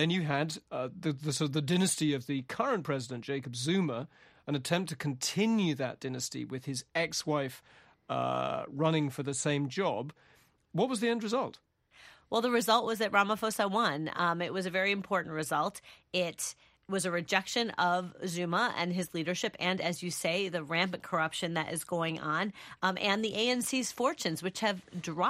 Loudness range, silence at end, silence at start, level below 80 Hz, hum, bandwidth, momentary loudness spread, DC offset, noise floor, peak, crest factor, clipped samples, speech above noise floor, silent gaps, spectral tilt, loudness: 3 LU; 0 s; 0 s; -72 dBFS; none; 15.5 kHz; 8 LU; under 0.1%; -59 dBFS; -12 dBFS; 20 dB; under 0.1%; 27 dB; none; -4 dB/octave; -32 LUFS